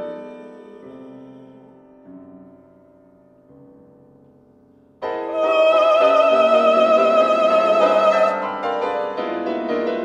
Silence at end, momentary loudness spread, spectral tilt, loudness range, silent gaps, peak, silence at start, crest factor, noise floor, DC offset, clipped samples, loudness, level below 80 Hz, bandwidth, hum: 0 s; 19 LU; -4.5 dB/octave; 13 LU; none; -4 dBFS; 0 s; 16 dB; -52 dBFS; under 0.1%; under 0.1%; -17 LUFS; -66 dBFS; 8.2 kHz; none